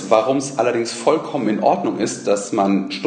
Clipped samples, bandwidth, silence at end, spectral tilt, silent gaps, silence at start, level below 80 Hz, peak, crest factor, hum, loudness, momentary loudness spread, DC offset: under 0.1%; 9.6 kHz; 0 s; -5 dB/octave; none; 0 s; -66 dBFS; 0 dBFS; 18 dB; none; -19 LUFS; 4 LU; under 0.1%